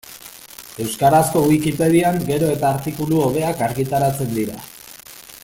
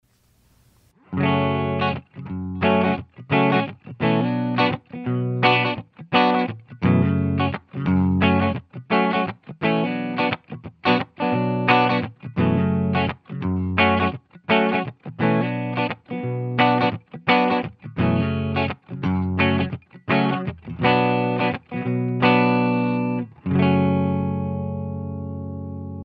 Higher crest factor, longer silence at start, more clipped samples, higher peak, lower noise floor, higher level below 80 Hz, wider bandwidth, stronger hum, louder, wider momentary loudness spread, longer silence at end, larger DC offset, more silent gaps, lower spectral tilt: about the same, 18 dB vs 20 dB; second, 0.05 s vs 1.1 s; neither; about the same, -2 dBFS vs -2 dBFS; second, -40 dBFS vs -60 dBFS; about the same, -48 dBFS vs -52 dBFS; first, 17 kHz vs 5.8 kHz; neither; first, -18 LUFS vs -22 LUFS; first, 21 LU vs 11 LU; about the same, 0.05 s vs 0 s; neither; neither; second, -6 dB/octave vs -9 dB/octave